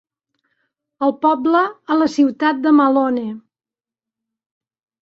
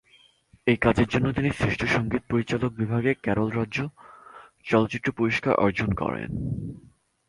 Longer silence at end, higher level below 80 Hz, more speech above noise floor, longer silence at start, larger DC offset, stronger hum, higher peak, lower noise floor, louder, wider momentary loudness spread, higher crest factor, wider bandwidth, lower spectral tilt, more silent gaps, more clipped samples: first, 1.65 s vs 0.5 s; second, -66 dBFS vs -46 dBFS; first, over 74 dB vs 35 dB; first, 1 s vs 0.65 s; neither; neither; about the same, -4 dBFS vs -6 dBFS; first, under -90 dBFS vs -59 dBFS; first, -16 LUFS vs -25 LUFS; about the same, 9 LU vs 9 LU; about the same, 16 dB vs 20 dB; second, 7.6 kHz vs 11.5 kHz; second, -5.5 dB/octave vs -7 dB/octave; neither; neither